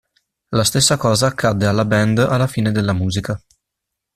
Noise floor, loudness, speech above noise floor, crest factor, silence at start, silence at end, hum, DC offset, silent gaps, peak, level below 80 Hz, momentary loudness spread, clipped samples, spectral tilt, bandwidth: -80 dBFS; -17 LUFS; 64 dB; 16 dB; 0.5 s; 0.8 s; none; under 0.1%; none; -2 dBFS; -46 dBFS; 9 LU; under 0.1%; -4.5 dB/octave; 14.5 kHz